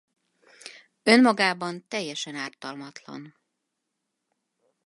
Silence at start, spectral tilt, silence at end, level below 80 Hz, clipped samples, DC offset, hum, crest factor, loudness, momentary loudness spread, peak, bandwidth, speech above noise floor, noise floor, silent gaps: 0.65 s; -4 dB/octave; 1.55 s; -80 dBFS; under 0.1%; under 0.1%; none; 26 dB; -23 LUFS; 26 LU; -2 dBFS; 11.5 kHz; 56 dB; -81 dBFS; none